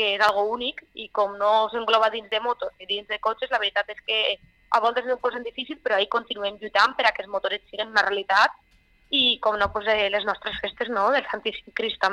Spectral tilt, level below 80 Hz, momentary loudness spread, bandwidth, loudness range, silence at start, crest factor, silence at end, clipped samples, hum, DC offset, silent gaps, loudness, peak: -2.5 dB/octave; -56 dBFS; 9 LU; 12 kHz; 3 LU; 0 s; 20 dB; 0 s; under 0.1%; none; under 0.1%; none; -24 LUFS; -4 dBFS